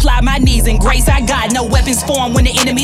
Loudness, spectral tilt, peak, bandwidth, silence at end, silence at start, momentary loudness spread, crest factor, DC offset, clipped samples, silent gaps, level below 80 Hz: -13 LUFS; -4 dB/octave; 0 dBFS; 15.5 kHz; 0 s; 0 s; 2 LU; 10 dB; under 0.1%; under 0.1%; none; -14 dBFS